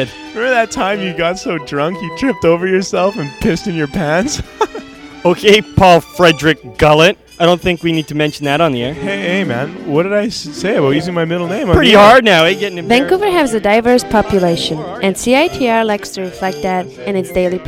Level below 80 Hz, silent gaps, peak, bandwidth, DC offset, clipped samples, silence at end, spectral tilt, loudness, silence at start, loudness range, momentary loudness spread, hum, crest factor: -34 dBFS; none; 0 dBFS; 17 kHz; under 0.1%; 0.4%; 0 s; -5 dB/octave; -13 LUFS; 0 s; 6 LU; 11 LU; none; 12 dB